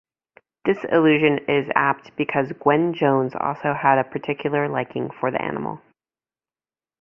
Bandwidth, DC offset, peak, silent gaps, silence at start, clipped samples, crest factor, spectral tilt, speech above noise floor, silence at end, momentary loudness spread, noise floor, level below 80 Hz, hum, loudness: 6 kHz; under 0.1%; -2 dBFS; none; 0.65 s; under 0.1%; 20 dB; -9 dB/octave; over 69 dB; 1.25 s; 9 LU; under -90 dBFS; -62 dBFS; none; -21 LUFS